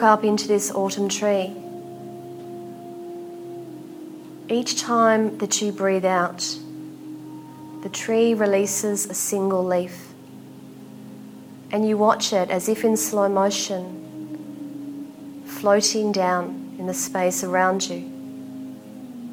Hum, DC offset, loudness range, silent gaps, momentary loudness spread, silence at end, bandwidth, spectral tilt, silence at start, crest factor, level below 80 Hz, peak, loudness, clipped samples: none; under 0.1%; 4 LU; none; 20 LU; 0 s; 19 kHz; -3.5 dB/octave; 0 s; 20 dB; -72 dBFS; -2 dBFS; -22 LUFS; under 0.1%